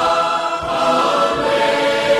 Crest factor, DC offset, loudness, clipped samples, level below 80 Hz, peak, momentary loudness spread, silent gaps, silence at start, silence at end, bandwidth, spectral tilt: 12 dB; under 0.1%; -16 LUFS; under 0.1%; -48 dBFS; -4 dBFS; 4 LU; none; 0 s; 0 s; 14.5 kHz; -3.5 dB/octave